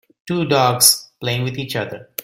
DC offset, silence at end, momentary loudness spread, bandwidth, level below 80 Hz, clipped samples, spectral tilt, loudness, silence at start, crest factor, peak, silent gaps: under 0.1%; 0 s; 14 LU; 17 kHz; -56 dBFS; under 0.1%; -3 dB/octave; -17 LUFS; 0.25 s; 20 dB; 0 dBFS; none